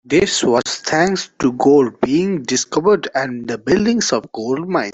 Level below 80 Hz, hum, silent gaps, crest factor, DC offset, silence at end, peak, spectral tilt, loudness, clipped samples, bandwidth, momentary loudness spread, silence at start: -50 dBFS; none; none; 14 dB; under 0.1%; 0 s; -2 dBFS; -4 dB/octave; -17 LUFS; under 0.1%; 8.4 kHz; 8 LU; 0.1 s